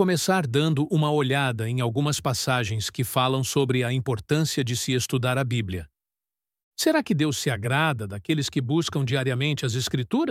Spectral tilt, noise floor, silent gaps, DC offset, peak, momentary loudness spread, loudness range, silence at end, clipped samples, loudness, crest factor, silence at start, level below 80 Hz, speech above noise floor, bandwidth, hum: -5 dB/octave; under -90 dBFS; 6.63-6.71 s; under 0.1%; -8 dBFS; 4 LU; 2 LU; 0 s; under 0.1%; -24 LUFS; 16 dB; 0 s; -56 dBFS; over 66 dB; 16.5 kHz; none